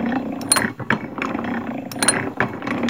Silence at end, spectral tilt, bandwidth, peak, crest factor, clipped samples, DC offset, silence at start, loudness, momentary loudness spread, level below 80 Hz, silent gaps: 0 s; -3 dB/octave; 17 kHz; 0 dBFS; 22 dB; under 0.1%; 0.2%; 0 s; -21 LUFS; 8 LU; -52 dBFS; none